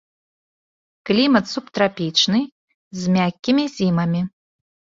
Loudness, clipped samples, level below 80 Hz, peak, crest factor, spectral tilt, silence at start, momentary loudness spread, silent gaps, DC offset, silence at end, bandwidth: -19 LUFS; under 0.1%; -58 dBFS; -2 dBFS; 18 dB; -5 dB/octave; 1.05 s; 12 LU; 2.52-2.68 s, 2.74-2.91 s; under 0.1%; 0.65 s; 7.6 kHz